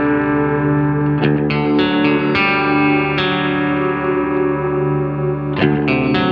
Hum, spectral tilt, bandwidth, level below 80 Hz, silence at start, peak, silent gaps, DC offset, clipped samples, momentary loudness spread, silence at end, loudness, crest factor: none; -9 dB/octave; 5.6 kHz; -42 dBFS; 0 s; -2 dBFS; none; under 0.1%; under 0.1%; 4 LU; 0 s; -16 LUFS; 14 dB